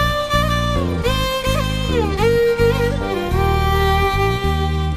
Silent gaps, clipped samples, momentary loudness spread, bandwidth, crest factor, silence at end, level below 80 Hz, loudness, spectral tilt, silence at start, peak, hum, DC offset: none; under 0.1%; 4 LU; 16 kHz; 14 dB; 0 s; -24 dBFS; -18 LUFS; -5.5 dB/octave; 0 s; -2 dBFS; none; under 0.1%